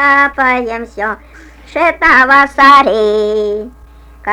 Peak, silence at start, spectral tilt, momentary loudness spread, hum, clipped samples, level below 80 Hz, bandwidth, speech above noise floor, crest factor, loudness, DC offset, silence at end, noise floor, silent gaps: 0 dBFS; 0 s; -4 dB/octave; 16 LU; none; 0.2%; -38 dBFS; 15 kHz; 21 dB; 12 dB; -9 LUFS; under 0.1%; 0 s; -32 dBFS; none